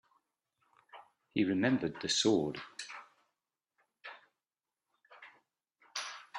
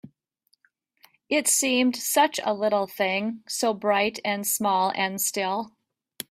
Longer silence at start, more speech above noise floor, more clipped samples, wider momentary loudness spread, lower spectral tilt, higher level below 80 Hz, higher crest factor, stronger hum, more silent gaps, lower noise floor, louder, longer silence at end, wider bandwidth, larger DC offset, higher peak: first, 0.95 s vs 0.05 s; first, over 58 dB vs 46 dB; neither; first, 23 LU vs 8 LU; first, -4 dB/octave vs -2 dB/octave; about the same, -74 dBFS vs -72 dBFS; about the same, 22 dB vs 18 dB; neither; neither; first, under -90 dBFS vs -71 dBFS; second, -34 LUFS vs -24 LUFS; second, 0 s vs 0.65 s; second, 11.5 kHz vs 16 kHz; neither; second, -16 dBFS vs -8 dBFS